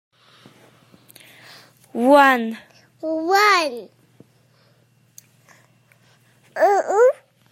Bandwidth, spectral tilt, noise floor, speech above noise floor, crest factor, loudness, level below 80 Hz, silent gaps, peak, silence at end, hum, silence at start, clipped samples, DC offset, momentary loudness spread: 16 kHz; -3 dB/octave; -58 dBFS; 42 dB; 20 dB; -17 LUFS; -74 dBFS; none; -2 dBFS; 0.4 s; none; 1.95 s; under 0.1%; under 0.1%; 22 LU